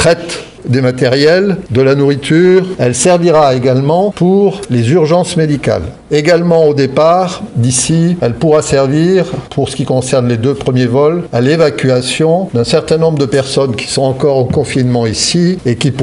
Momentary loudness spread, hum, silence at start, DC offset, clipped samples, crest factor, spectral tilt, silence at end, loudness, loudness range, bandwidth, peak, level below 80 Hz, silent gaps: 5 LU; none; 0 s; under 0.1%; under 0.1%; 10 dB; -5.5 dB/octave; 0 s; -11 LUFS; 2 LU; 11.5 kHz; 0 dBFS; -40 dBFS; none